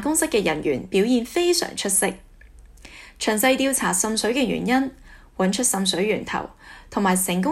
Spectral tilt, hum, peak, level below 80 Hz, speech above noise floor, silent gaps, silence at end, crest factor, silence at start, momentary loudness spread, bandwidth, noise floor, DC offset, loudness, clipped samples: -3.5 dB/octave; none; -6 dBFS; -50 dBFS; 25 dB; none; 0 s; 18 dB; 0 s; 9 LU; 16 kHz; -47 dBFS; under 0.1%; -21 LUFS; under 0.1%